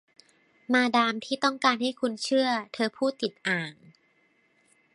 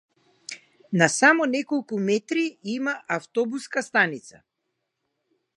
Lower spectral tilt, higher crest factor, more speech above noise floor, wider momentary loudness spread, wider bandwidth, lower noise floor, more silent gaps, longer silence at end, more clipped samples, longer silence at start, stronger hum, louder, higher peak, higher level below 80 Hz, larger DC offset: about the same, -3.5 dB/octave vs -4 dB/octave; about the same, 22 dB vs 22 dB; second, 40 dB vs 56 dB; second, 7 LU vs 21 LU; about the same, 11.5 kHz vs 11.5 kHz; second, -67 dBFS vs -79 dBFS; neither; about the same, 1.2 s vs 1.25 s; neither; first, 0.7 s vs 0.5 s; neither; second, -26 LUFS vs -23 LUFS; second, -6 dBFS vs -2 dBFS; about the same, -80 dBFS vs -78 dBFS; neither